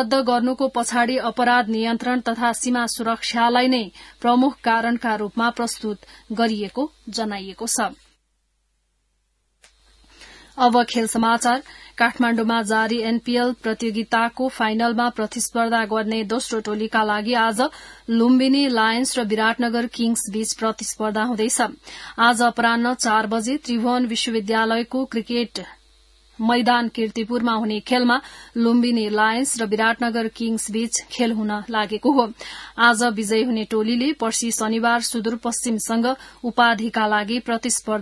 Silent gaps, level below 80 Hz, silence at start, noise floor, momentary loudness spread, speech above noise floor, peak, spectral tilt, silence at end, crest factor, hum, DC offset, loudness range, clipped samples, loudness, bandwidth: none; -58 dBFS; 0 s; -69 dBFS; 7 LU; 48 dB; -2 dBFS; -3 dB/octave; 0 s; 20 dB; none; under 0.1%; 4 LU; under 0.1%; -21 LUFS; 12 kHz